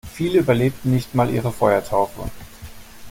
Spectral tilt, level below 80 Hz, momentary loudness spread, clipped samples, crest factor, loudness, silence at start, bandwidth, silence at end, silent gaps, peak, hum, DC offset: -7 dB/octave; -42 dBFS; 22 LU; under 0.1%; 18 dB; -20 LUFS; 0.05 s; 17 kHz; 0 s; none; -2 dBFS; none; under 0.1%